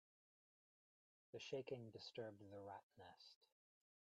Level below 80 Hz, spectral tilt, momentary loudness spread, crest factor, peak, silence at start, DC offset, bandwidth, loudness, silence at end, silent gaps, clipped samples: under -90 dBFS; -5 dB/octave; 14 LU; 20 dB; -38 dBFS; 1.35 s; under 0.1%; 8.2 kHz; -55 LUFS; 0.55 s; 2.83-2.90 s, 3.36-3.41 s; under 0.1%